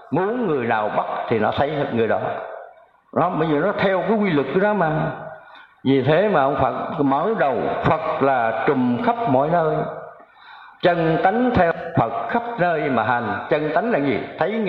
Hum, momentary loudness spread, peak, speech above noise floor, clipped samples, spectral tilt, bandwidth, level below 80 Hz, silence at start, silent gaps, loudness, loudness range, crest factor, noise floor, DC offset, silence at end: none; 6 LU; -4 dBFS; 27 dB; under 0.1%; -9.5 dB/octave; 5.8 kHz; -50 dBFS; 0 s; none; -20 LUFS; 2 LU; 16 dB; -47 dBFS; under 0.1%; 0 s